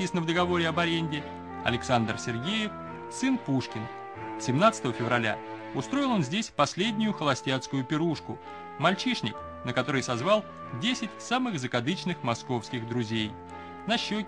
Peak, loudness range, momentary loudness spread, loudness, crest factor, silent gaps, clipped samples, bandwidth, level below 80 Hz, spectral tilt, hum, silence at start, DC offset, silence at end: -8 dBFS; 3 LU; 11 LU; -29 LUFS; 22 dB; none; under 0.1%; 10.5 kHz; -60 dBFS; -5 dB/octave; none; 0 s; under 0.1%; 0 s